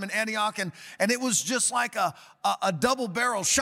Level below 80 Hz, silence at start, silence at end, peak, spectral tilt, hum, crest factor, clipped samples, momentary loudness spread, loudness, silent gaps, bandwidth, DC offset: -64 dBFS; 0 s; 0 s; -10 dBFS; -2 dB/octave; none; 16 dB; under 0.1%; 7 LU; -26 LUFS; none; 17.5 kHz; under 0.1%